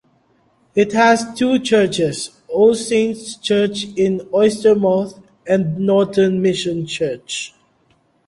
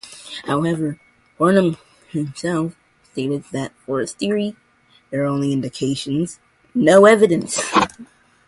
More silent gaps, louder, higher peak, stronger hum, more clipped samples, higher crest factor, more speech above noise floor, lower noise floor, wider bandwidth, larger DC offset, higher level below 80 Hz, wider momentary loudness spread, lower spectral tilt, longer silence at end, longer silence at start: neither; about the same, -17 LUFS vs -19 LUFS; about the same, -2 dBFS vs 0 dBFS; neither; neither; about the same, 16 dB vs 18 dB; first, 43 dB vs 38 dB; about the same, -59 dBFS vs -56 dBFS; about the same, 11.5 kHz vs 11.5 kHz; neither; about the same, -56 dBFS vs -56 dBFS; second, 11 LU vs 16 LU; about the same, -5 dB/octave vs -5.5 dB/octave; first, 0.8 s vs 0.45 s; first, 0.75 s vs 0.05 s